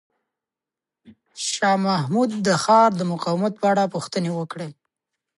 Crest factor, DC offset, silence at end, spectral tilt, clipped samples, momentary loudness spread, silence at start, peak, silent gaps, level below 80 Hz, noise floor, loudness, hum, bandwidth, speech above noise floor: 18 dB; under 0.1%; 0.7 s; -5 dB/octave; under 0.1%; 13 LU; 1.1 s; -4 dBFS; none; -70 dBFS; -88 dBFS; -21 LUFS; none; 11.5 kHz; 68 dB